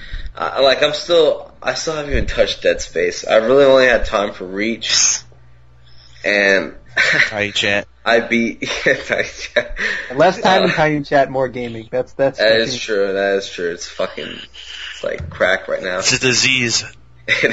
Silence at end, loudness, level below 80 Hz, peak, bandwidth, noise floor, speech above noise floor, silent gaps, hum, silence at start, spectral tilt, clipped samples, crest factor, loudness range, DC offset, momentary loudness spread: 0 s; -16 LUFS; -36 dBFS; 0 dBFS; 8 kHz; -47 dBFS; 30 dB; none; none; 0 s; -2.5 dB/octave; under 0.1%; 16 dB; 4 LU; 0.6%; 11 LU